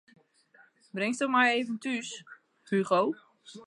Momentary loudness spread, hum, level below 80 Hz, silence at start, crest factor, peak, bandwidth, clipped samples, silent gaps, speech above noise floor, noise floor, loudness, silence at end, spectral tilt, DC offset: 18 LU; none; -86 dBFS; 0.95 s; 20 dB; -12 dBFS; 11.5 kHz; under 0.1%; none; 34 dB; -62 dBFS; -28 LUFS; 0 s; -4.5 dB/octave; under 0.1%